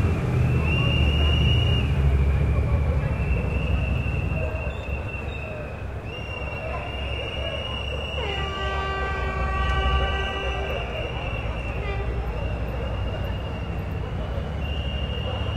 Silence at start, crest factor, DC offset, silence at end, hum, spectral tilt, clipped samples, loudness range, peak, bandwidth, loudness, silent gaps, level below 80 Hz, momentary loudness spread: 0 s; 16 dB; under 0.1%; 0 s; none; -6.5 dB/octave; under 0.1%; 7 LU; -10 dBFS; 8.8 kHz; -26 LUFS; none; -28 dBFS; 9 LU